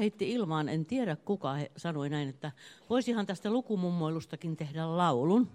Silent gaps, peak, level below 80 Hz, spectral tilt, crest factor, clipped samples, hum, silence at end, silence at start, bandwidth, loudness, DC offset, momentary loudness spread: none; -14 dBFS; -74 dBFS; -7 dB/octave; 18 dB; under 0.1%; none; 0 s; 0 s; 11 kHz; -33 LUFS; under 0.1%; 9 LU